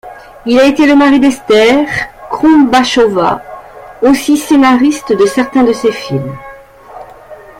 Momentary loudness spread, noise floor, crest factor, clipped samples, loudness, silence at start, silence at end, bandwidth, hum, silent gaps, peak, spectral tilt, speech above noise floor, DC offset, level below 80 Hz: 13 LU; -33 dBFS; 10 dB; under 0.1%; -9 LUFS; 0.05 s; 0.25 s; 16 kHz; none; none; 0 dBFS; -5 dB/octave; 24 dB; under 0.1%; -42 dBFS